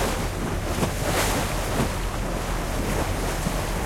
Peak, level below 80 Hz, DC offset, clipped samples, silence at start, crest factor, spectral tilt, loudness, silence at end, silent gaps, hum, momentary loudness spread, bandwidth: -10 dBFS; -30 dBFS; under 0.1%; under 0.1%; 0 s; 16 dB; -4.5 dB/octave; -26 LUFS; 0 s; none; none; 5 LU; 16.5 kHz